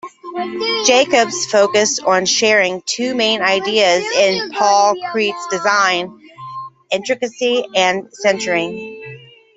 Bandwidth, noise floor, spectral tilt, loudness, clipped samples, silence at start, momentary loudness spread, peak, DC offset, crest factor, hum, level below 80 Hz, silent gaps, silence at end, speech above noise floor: 8.4 kHz; -37 dBFS; -2 dB/octave; -15 LUFS; under 0.1%; 0.05 s; 17 LU; 0 dBFS; under 0.1%; 16 dB; none; -64 dBFS; none; 0.4 s; 22 dB